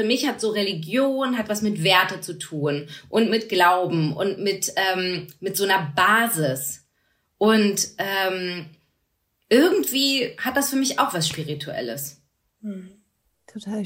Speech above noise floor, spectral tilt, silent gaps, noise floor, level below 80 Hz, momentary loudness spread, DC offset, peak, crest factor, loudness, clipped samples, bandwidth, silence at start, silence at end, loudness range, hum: 50 dB; -3.5 dB/octave; none; -72 dBFS; -66 dBFS; 14 LU; under 0.1%; -2 dBFS; 20 dB; -22 LUFS; under 0.1%; 16 kHz; 0 s; 0 s; 3 LU; none